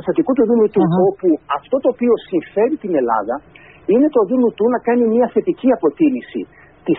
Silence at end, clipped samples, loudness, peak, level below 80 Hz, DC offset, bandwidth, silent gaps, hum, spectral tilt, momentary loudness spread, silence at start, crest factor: 0 s; under 0.1%; -16 LUFS; -2 dBFS; -56 dBFS; under 0.1%; 4 kHz; none; none; -7 dB/octave; 11 LU; 0 s; 14 dB